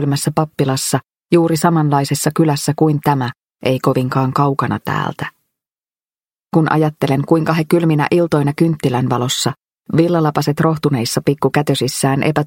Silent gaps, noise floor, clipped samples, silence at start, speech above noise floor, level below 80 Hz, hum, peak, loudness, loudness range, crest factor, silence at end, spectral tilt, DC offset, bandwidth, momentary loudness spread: none; under -90 dBFS; under 0.1%; 0 s; over 75 dB; -54 dBFS; none; 0 dBFS; -16 LUFS; 3 LU; 16 dB; 0 s; -6 dB/octave; under 0.1%; 17 kHz; 6 LU